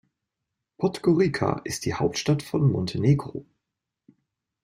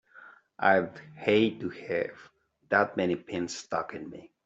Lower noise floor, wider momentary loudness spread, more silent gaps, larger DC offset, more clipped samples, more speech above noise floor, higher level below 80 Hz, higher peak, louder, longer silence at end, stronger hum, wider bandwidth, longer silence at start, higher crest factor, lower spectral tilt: first, -85 dBFS vs -54 dBFS; second, 7 LU vs 14 LU; neither; neither; neither; first, 61 dB vs 25 dB; first, -56 dBFS vs -72 dBFS; about the same, -8 dBFS vs -8 dBFS; first, -25 LUFS vs -29 LUFS; first, 1.2 s vs 0.2 s; neither; first, 15.5 kHz vs 8.2 kHz; first, 0.8 s vs 0.15 s; about the same, 20 dB vs 22 dB; first, -6.5 dB/octave vs -5 dB/octave